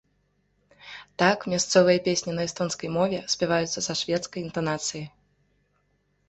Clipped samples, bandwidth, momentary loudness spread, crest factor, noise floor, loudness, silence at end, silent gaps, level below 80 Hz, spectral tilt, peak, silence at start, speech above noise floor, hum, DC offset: under 0.1%; 8.4 kHz; 16 LU; 22 dB; -70 dBFS; -25 LUFS; 1.2 s; none; -62 dBFS; -3.5 dB/octave; -6 dBFS; 0.85 s; 45 dB; none; under 0.1%